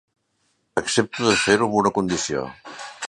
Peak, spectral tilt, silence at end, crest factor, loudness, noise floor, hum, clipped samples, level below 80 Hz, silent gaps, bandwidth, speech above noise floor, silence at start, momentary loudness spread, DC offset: -2 dBFS; -3.5 dB/octave; 0 s; 22 dB; -21 LUFS; -69 dBFS; none; under 0.1%; -54 dBFS; none; 11.5 kHz; 48 dB; 0.75 s; 16 LU; under 0.1%